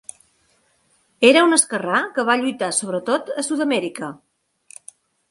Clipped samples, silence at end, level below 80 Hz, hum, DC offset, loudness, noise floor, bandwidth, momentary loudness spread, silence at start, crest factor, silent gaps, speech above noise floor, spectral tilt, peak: under 0.1%; 1.15 s; -70 dBFS; none; under 0.1%; -18 LUFS; -62 dBFS; 11.5 kHz; 23 LU; 1.2 s; 20 dB; none; 44 dB; -2.5 dB/octave; 0 dBFS